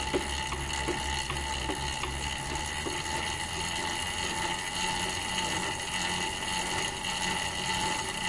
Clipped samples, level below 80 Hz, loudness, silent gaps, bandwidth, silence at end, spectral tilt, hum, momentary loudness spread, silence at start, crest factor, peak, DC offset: under 0.1%; -44 dBFS; -31 LUFS; none; 11.5 kHz; 0 s; -2 dB/octave; none; 3 LU; 0 s; 16 dB; -16 dBFS; under 0.1%